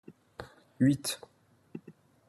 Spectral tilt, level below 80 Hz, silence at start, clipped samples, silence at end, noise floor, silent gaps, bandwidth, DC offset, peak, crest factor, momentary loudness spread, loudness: -5 dB/octave; -68 dBFS; 0.1 s; under 0.1%; 0.35 s; -57 dBFS; none; 13 kHz; under 0.1%; -14 dBFS; 20 dB; 23 LU; -30 LUFS